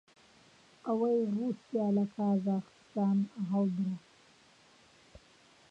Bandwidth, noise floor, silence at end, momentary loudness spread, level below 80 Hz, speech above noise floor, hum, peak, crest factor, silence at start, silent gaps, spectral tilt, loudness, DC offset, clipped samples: 7.8 kHz; -62 dBFS; 1.75 s; 7 LU; -74 dBFS; 31 dB; none; -20 dBFS; 14 dB; 0.85 s; none; -9.5 dB/octave; -33 LUFS; under 0.1%; under 0.1%